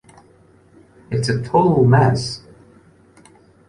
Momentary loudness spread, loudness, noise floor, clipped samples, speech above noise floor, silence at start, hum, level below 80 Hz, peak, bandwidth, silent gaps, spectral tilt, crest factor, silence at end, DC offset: 14 LU; -17 LUFS; -51 dBFS; under 0.1%; 36 dB; 1.1 s; none; -48 dBFS; -2 dBFS; 11.5 kHz; none; -7 dB/octave; 18 dB; 1.3 s; under 0.1%